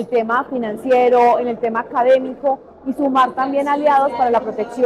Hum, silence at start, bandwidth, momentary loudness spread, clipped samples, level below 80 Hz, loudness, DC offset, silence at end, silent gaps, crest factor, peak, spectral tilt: none; 0 s; 11.5 kHz; 9 LU; under 0.1%; -56 dBFS; -17 LUFS; under 0.1%; 0 s; none; 12 dB; -4 dBFS; -6 dB/octave